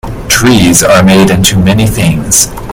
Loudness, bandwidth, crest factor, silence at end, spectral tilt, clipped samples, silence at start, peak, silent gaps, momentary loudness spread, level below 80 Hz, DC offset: -6 LUFS; over 20 kHz; 6 dB; 0 s; -4 dB/octave; 2%; 0.05 s; 0 dBFS; none; 4 LU; -24 dBFS; under 0.1%